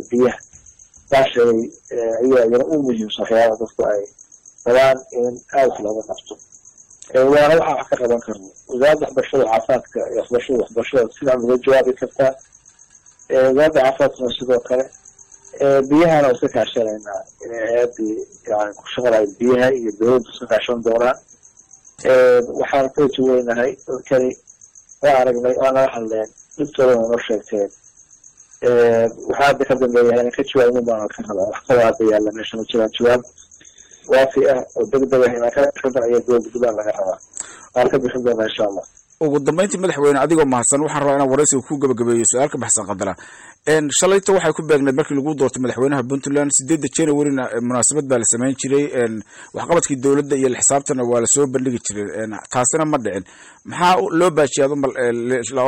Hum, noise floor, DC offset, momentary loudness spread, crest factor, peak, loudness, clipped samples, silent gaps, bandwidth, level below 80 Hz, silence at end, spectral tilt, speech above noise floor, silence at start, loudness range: none; -49 dBFS; under 0.1%; 10 LU; 12 dB; -6 dBFS; -17 LUFS; under 0.1%; none; 13.5 kHz; -52 dBFS; 0 s; -4 dB/octave; 32 dB; 0 s; 2 LU